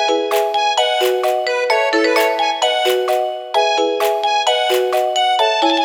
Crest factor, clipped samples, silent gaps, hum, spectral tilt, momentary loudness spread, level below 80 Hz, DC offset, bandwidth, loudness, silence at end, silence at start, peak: 14 dB; under 0.1%; none; none; 0 dB/octave; 3 LU; -70 dBFS; under 0.1%; over 20 kHz; -16 LUFS; 0 s; 0 s; -2 dBFS